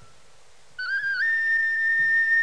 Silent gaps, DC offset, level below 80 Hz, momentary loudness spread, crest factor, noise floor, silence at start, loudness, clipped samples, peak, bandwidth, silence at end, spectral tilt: none; 0.5%; -68 dBFS; 8 LU; 10 dB; -57 dBFS; 0.8 s; -21 LUFS; under 0.1%; -14 dBFS; 10.5 kHz; 0 s; -0.5 dB/octave